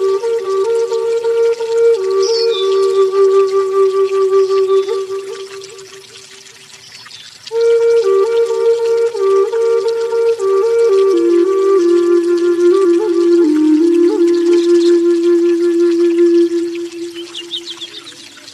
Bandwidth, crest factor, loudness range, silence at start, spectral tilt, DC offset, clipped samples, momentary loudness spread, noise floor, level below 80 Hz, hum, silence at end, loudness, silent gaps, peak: 11.5 kHz; 10 dB; 6 LU; 0 s; -3.5 dB/octave; under 0.1%; under 0.1%; 15 LU; -38 dBFS; -72 dBFS; none; 0 s; -13 LUFS; none; -4 dBFS